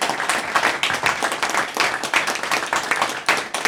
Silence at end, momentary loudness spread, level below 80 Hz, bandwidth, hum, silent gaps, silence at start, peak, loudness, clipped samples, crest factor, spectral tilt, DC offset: 0 s; 3 LU; -58 dBFS; over 20 kHz; none; none; 0 s; -2 dBFS; -20 LUFS; under 0.1%; 20 dB; -1 dB/octave; under 0.1%